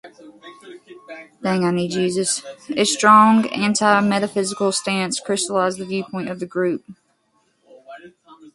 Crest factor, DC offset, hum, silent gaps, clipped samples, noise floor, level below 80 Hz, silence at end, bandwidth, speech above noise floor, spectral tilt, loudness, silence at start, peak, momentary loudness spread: 20 dB; under 0.1%; none; none; under 0.1%; -64 dBFS; -64 dBFS; 0.05 s; 11.5 kHz; 46 dB; -4 dB/octave; -19 LUFS; 0.05 s; 0 dBFS; 15 LU